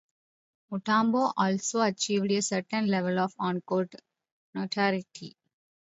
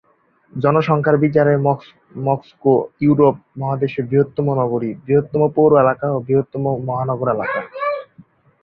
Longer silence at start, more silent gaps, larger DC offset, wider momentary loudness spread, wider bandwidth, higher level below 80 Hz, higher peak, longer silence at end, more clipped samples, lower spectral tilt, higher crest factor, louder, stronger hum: first, 0.7 s vs 0.55 s; first, 4.32-4.53 s vs none; neither; first, 12 LU vs 9 LU; first, 8.2 kHz vs 5.4 kHz; second, -76 dBFS vs -54 dBFS; second, -12 dBFS vs -2 dBFS; about the same, 0.65 s vs 0.6 s; neither; second, -4.5 dB/octave vs -10.5 dB/octave; about the same, 18 dB vs 16 dB; second, -28 LUFS vs -18 LUFS; neither